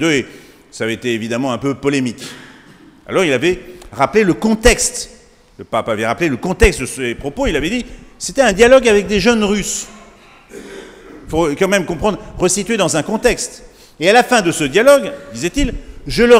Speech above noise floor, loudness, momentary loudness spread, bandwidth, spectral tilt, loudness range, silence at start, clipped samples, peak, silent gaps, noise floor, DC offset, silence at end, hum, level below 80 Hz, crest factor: 29 dB; -15 LUFS; 18 LU; 16 kHz; -4 dB/octave; 5 LU; 0 s; 0.1%; 0 dBFS; none; -43 dBFS; under 0.1%; 0 s; none; -30 dBFS; 16 dB